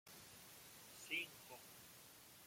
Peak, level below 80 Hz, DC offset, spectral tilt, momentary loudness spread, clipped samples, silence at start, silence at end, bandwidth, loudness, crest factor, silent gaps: -32 dBFS; -86 dBFS; under 0.1%; -1 dB/octave; 14 LU; under 0.1%; 0.05 s; 0 s; 16.5 kHz; -52 LUFS; 24 dB; none